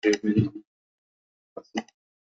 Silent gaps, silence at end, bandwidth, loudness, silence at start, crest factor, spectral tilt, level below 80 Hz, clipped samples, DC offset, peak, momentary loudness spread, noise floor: 0.67-1.56 s; 0.4 s; 7.8 kHz; -27 LUFS; 0.05 s; 20 dB; -6 dB/octave; -64 dBFS; under 0.1%; under 0.1%; -10 dBFS; 23 LU; under -90 dBFS